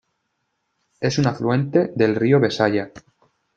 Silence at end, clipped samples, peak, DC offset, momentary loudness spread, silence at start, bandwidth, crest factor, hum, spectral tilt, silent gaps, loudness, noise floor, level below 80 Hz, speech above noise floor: 0.6 s; under 0.1%; -2 dBFS; under 0.1%; 9 LU; 1 s; 7.8 kHz; 18 dB; none; -6.5 dB/octave; none; -20 LUFS; -74 dBFS; -60 dBFS; 55 dB